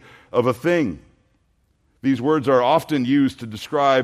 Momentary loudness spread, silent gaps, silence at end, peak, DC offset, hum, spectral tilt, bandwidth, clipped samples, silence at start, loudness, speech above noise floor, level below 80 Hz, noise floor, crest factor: 9 LU; none; 0 s; -4 dBFS; under 0.1%; none; -6.5 dB/octave; 14.5 kHz; under 0.1%; 0.35 s; -20 LUFS; 45 dB; -58 dBFS; -64 dBFS; 16 dB